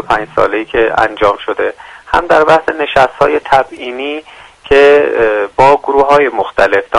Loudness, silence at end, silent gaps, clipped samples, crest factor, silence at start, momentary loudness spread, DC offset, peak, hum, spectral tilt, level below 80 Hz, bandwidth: -11 LUFS; 0 s; none; 0.4%; 10 dB; 0 s; 11 LU; under 0.1%; 0 dBFS; none; -5 dB/octave; -36 dBFS; 11 kHz